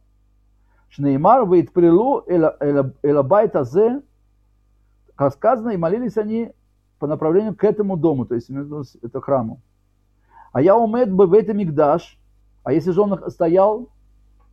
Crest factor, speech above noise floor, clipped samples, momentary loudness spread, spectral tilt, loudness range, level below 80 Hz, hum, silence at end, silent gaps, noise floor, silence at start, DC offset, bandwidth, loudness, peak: 16 dB; 43 dB; under 0.1%; 14 LU; -10 dB/octave; 5 LU; -54 dBFS; 50 Hz at -50 dBFS; 0.65 s; none; -61 dBFS; 1 s; under 0.1%; 6.6 kHz; -18 LUFS; -2 dBFS